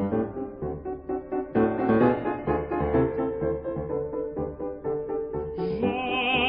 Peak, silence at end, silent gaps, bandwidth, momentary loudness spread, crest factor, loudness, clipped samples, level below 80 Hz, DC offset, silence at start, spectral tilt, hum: -8 dBFS; 0 s; none; 5.4 kHz; 10 LU; 18 dB; -28 LUFS; under 0.1%; -46 dBFS; under 0.1%; 0 s; -10.5 dB/octave; none